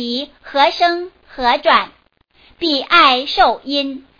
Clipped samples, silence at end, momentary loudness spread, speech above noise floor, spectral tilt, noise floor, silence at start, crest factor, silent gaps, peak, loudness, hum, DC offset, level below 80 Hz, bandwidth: under 0.1%; 0.2 s; 13 LU; 37 dB; -3 dB/octave; -53 dBFS; 0 s; 16 dB; none; 0 dBFS; -15 LUFS; none; under 0.1%; -48 dBFS; 5.2 kHz